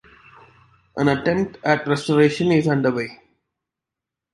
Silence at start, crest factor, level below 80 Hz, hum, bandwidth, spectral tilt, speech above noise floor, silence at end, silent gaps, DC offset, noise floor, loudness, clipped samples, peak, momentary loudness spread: 0.95 s; 18 dB; -56 dBFS; none; 11.5 kHz; -6.5 dB/octave; 67 dB; 1.2 s; none; under 0.1%; -86 dBFS; -20 LUFS; under 0.1%; -2 dBFS; 9 LU